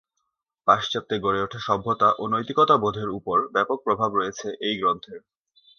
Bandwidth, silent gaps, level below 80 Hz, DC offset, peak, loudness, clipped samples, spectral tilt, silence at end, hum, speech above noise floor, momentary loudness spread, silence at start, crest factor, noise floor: 6.8 kHz; none; -60 dBFS; under 0.1%; -2 dBFS; -23 LUFS; under 0.1%; -5 dB/octave; 0.6 s; none; 55 dB; 8 LU; 0.65 s; 22 dB; -79 dBFS